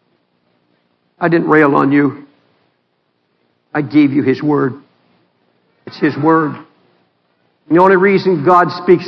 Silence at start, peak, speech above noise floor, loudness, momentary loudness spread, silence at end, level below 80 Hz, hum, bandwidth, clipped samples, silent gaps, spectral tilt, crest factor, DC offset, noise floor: 1.2 s; 0 dBFS; 52 dB; -13 LUFS; 12 LU; 0 s; -60 dBFS; none; 6 kHz; 0.1%; none; -9 dB/octave; 14 dB; under 0.1%; -64 dBFS